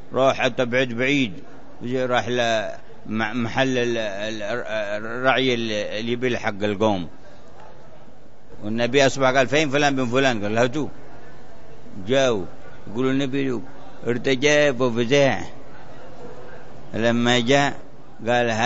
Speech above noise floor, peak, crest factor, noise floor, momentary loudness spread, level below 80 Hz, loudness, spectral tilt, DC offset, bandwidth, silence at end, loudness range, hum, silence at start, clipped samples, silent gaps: 27 dB; -2 dBFS; 20 dB; -49 dBFS; 20 LU; -54 dBFS; -21 LUFS; -4.5 dB/octave; 4%; 8 kHz; 0 s; 4 LU; none; 0 s; under 0.1%; none